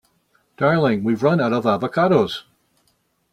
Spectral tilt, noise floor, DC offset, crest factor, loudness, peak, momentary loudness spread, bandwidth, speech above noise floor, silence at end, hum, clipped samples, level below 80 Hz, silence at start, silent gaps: -7.5 dB/octave; -66 dBFS; under 0.1%; 18 dB; -19 LUFS; -4 dBFS; 5 LU; 13.5 kHz; 48 dB; 0.9 s; none; under 0.1%; -60 dBFS; 0.6 s; none